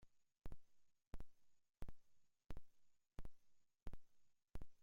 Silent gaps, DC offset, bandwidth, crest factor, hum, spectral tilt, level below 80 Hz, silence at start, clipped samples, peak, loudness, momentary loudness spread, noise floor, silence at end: none; under 0.1%; 7.2 kHz; 14 dB; none; -6.5 dB/octave; -62 dBFS; 0 s; under 0.1%; -38 dBFS; -65 LUFS; 5 LU; -72 dBFS; 0 s